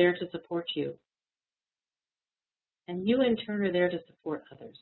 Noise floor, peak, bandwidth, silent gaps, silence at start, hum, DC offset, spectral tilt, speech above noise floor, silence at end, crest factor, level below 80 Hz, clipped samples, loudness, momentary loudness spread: under -90 dBFS; -12 dBFS; 4.2 kHz; none; 0 s; none; under 0.1%; -9.5 dB/octave; over 60 dB; 0.1 s; 20 dB; -70 dBFS; under 0.1%; -31 LUFS; 12 LU